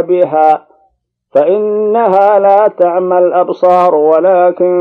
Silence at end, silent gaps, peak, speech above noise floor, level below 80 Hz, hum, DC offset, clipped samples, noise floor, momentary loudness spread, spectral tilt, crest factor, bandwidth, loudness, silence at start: 0 s; none; 0 dBFS; 49 dB; -64 dBFS; none; under 0.1%; 0.5%; -58 dBFS; 4 LU; -8.5 dB/octave; 10 dB; 5 kHz; -9 LUFS; 0 s